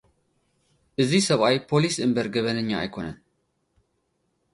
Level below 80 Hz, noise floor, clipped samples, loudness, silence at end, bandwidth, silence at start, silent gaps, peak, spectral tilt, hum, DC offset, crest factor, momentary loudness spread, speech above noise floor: -58 dBFS; -73 dBFS; under 0.1%; -23 LUFS; 1.4 s; 11.5 kHz; 1 s; none; -6 dBFS; -5 dB/octave; none; under 0.1%; 20 dB; 14 LU; 50 dB